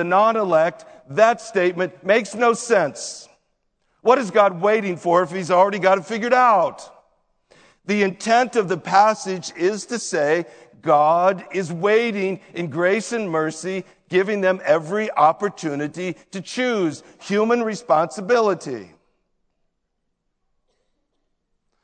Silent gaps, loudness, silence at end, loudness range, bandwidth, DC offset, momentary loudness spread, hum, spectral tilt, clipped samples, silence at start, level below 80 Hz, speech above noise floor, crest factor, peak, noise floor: none; -20 LUFS; 3 s; 4 LU; 9.4 kHz; under 0.1%; 12 LU; none; -4.5 dB/octave; under 0.1%; 0 s; -72 dBFS; 54 dB; 20 dB; 0 dBFS; -74 dBFS